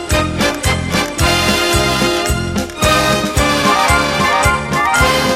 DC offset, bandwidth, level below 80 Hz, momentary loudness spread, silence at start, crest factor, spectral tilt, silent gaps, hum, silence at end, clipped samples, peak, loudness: under 0.1%; 16.5 kHz; -26 dBFS; 5 LU; 0 s; 14 dB; -3.5 dB/octave; none; none; 0 s; under 0.1%; 0 dBFS; -13 LUFS